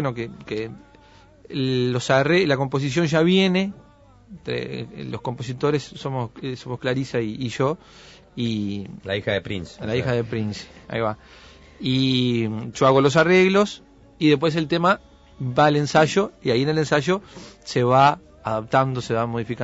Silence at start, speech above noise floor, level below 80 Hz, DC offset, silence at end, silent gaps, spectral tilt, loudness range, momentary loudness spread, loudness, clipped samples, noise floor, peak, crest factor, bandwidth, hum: 0 s; 29 dB; -52 dBFS; under 0.1%; 0 s; none; -6 dB/octave; 8 LU; 14 LU; -22 LUFS; under 0.1%; -50 dBFS; -4 dBFS; 18 dB; 8 kHz; none